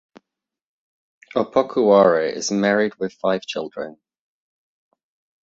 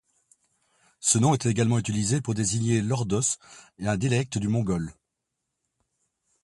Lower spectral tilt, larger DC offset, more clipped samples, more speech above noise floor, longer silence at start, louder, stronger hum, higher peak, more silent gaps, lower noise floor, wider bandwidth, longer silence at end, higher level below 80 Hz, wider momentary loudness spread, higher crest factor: about the same, -4.5 dB/octave vs -5 dB/octave; neither; neither; about the same, 59 dB vs 57 dB; first, 1.35 s vs 1 s; first, -19 LUFS vs -25 LUFS; neither; first, -2 dBFS vs -8 dBFS; neither; second, -78 dBFS vs -82 dBFS; second, 7.8 kHz vs 11.5 kHz; about the same, 1.5 s vs 1.55 s; second, -66 dBFS vs -54 dBFS; first, 15 LU vs 8 LU; about the same, 20 dB vs 20 dB